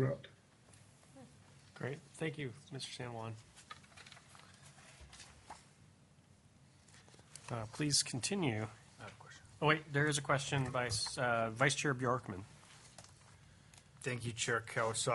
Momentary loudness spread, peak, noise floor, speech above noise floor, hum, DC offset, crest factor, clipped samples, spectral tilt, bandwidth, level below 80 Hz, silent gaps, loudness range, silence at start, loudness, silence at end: 25 LU; -16 dBFS; -65 dBFS; 28 dB; none; under 0.1%; 26 dB; under 0.1%; -3.5 dB/octave; 11.5 kHz; -70 dBFS; none; 21 LU; 0 s; -37 LUFS; 0 s